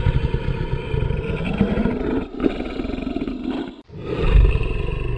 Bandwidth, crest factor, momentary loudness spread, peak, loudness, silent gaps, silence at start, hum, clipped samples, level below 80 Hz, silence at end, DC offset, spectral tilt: 5.2 kHz; 18 dB; 9 LU; -4 dBFS; -23 LUFS; none; 0 s; none; under 0.1%; -24 dBFS; 0 s; under 0.1%; -9 dB/octave